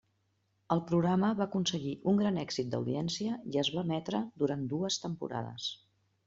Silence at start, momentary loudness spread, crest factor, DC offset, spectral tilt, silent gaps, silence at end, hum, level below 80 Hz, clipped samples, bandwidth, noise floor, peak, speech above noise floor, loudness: 0.7 s; 9 LU; 20 dB; under 0.1%; -5.5 dB/octave; none; 0.5 s; none; -68 dBFS; under 0.1%; 7.8 kHz; -76 dBFS; -14 dBFS; 44 dB; -33 LUFS